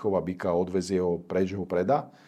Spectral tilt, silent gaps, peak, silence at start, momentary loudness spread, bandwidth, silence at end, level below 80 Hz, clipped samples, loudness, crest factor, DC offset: -7 dB/octave; none; -12 dBFS; 0 s; 3 LU; 11 kHz; 0.2 s; -64 dBFS; under 0.1%; -28 LUFS; 16 dB; under 0.1%